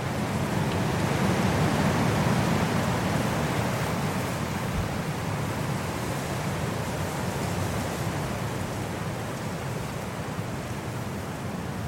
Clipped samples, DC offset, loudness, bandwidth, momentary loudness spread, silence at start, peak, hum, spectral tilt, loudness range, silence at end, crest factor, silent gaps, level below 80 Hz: under 0.1%; under 0.1%; -28 LUFS; 17 kHz; 9 LU; 0 s; -12 dBFS; none; -5.5 dB/octave; 6 LU; 0 s; 16 dB; none; -46 dBFS